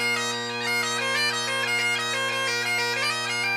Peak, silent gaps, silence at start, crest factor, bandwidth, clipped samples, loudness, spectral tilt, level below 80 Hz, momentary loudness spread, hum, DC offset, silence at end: -14 dBFS; none; 0 s; 12 dB; 15.5 kHz; under 0.1%; -24 LUFS; -1 dB/octave; -76 dBFS; 2 LU; none; under 0.1%; 0 s